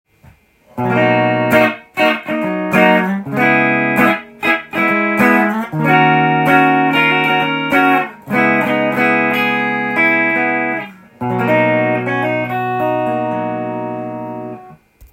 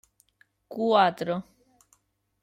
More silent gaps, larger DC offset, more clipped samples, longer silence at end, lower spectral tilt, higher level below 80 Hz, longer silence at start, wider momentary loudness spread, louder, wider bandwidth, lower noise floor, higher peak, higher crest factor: neither; neither; neither; second, 0.1 s vs 1 s; about the same, -6.5 dB/octave vs -6 dB/octave; first, -54 dBFS vs -72 dBFS; about the same, 0.75 s vs 0.7 s; about the same, 11 LU vs 13 LU; first, -14 LUFS vs -25 LUFS; about the same, 16.5 kHz vs 15 kHz; second, -47 dBFS vs -68 dBFS; first, 0 dBFS vs -8 dBFS; second, 14 dB vs 22 dB